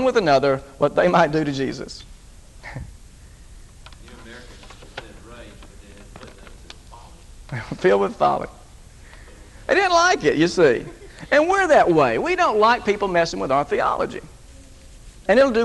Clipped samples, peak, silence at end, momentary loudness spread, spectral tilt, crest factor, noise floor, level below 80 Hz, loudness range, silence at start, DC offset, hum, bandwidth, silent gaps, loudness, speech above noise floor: under 0.1%; -2 dBFS; 0 s; 22 LU; -5 dB/octave; 18 dB; -44 dBFS; -44 dBFS; 23 LU; 0 s; under 0.1%; none; 12 kHz; none; -19 LUFS; 25 dB